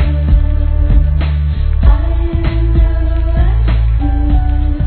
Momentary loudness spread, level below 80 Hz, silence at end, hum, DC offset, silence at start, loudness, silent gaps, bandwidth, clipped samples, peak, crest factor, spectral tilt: 3 LU; -12 dBFS; 0 s; none; 0.3%; 0 s; -14 LUFS; none; 4.4 kHz; 0.1%; 0 dBFS; 10 dB; -11.5 dB/octave